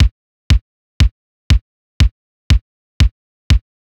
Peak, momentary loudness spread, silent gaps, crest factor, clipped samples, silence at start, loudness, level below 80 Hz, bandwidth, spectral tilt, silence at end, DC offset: -4 dBFS; 0 LU; 0.11-0.50 s, 0.61-1.00 s, 1.11-1.50 s, 1.61-2.00 s, 2.11-2.50 s, 2.61-3.00 s, 3.11-3.50 s; 12 dB; under 0.1%; 0 s; -18 LUFS; -18 dBFS; 11.5 kHz; -5.5 dB/octave; 0.4 s; under 0.1%